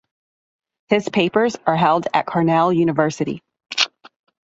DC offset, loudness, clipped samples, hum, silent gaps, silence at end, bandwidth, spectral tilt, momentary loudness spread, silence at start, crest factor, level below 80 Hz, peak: under 0.1%; -19 LUFS; under 0.1%; none; none; 0.65 s; 8 kHz; -5 dB/octave; 8 LU; 0.9 s; 18 dB; -62 dBFS; -2 dBFS